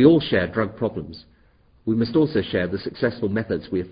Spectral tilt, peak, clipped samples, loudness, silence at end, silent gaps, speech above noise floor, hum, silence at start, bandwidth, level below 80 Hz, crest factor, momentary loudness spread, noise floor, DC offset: -11.5 dB/octave; -2 dBFS; under 0.1%; -23 LUFS; 0 s; none; 35 dB; none; 0 s; 5.2 kHz; -46 dBFS; 20 dB; 12 LU; -57 dBFS; under 0.1%